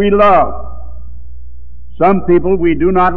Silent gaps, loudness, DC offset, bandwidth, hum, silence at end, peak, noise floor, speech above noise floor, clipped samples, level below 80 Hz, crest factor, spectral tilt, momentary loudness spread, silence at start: none; -11 LUFS; 10%; 4.7 kHz; 60 Hz at -30 dBFS; 0 s; 0 dBFS; -34 dBFS; 23 dB; under 0.1%; -30 dBFS; 10 dB; -9.5 dB/octave; 22 LU; 0 s